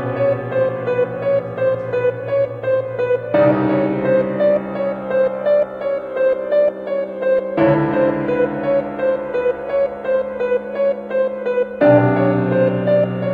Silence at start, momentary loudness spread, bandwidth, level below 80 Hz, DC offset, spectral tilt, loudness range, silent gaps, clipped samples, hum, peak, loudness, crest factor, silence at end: 0 s; 5 LU; 4.8 kHz; -52 dBFS; under 0.1%; -10 dB/octave; 2 LU; none; under 0.1%; none; 0 dBFS; -18 LUFS; 16 dB; 0 s